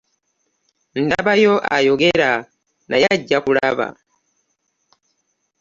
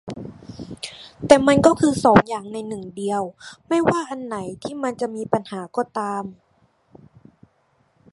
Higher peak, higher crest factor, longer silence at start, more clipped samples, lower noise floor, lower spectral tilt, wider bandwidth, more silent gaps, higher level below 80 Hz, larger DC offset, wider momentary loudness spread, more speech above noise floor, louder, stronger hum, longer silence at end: about the same, -2 dBFS vs 0 dBFS; about the same, 18 dB vs 22 dB; first, 0.95 s vs 0.05 s; neither; first, -70 dBFS vs -63 dBFS; about the same, -5 dB/octave vs -5.5 dB/octave; second, 7.4 kHz vs 11.5 kHz; neither; about the same, -54 dBFS vs -52 dBFS; neither; second, 9 LU vs 20 LU; first, 53 dB vs 43 dB; first, -17 LUFS vs -20 LUFS; neither; about the same, 1.7 s vs 1.8 s